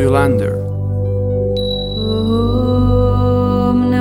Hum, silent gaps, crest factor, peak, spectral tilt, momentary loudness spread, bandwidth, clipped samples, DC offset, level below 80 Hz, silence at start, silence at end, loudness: 50 Hz at -35 dBFS; none; 14 dB; 0 dBFS; -8 dB/octave; 6 LU; 12 kHz; under 0.1%; under 0.1%; -26 dBFS; 0 s; 0 s; -15 LUFS